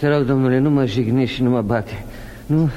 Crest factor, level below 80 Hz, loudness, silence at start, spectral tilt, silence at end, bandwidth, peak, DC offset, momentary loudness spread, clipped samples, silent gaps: 12 dB; -40 dBFS; -18 LUFS; 0 s; -8 dB/octave; 0 s; 13.5 kHz; -4 dBFS; under 0.1%; 16 LU; under 0.1%; none